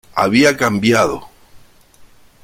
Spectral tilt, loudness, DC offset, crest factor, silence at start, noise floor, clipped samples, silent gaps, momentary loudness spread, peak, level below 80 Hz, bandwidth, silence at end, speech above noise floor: -4.5 dB/octave; -14 LUFS; under 0.1%; 16 dB; 0.15 s; -45 dBFS; under 0.1%; none; 7 LU; 0 dBFS; -48 dBFS; 16.5 kHz; 0.85 s; 31 dB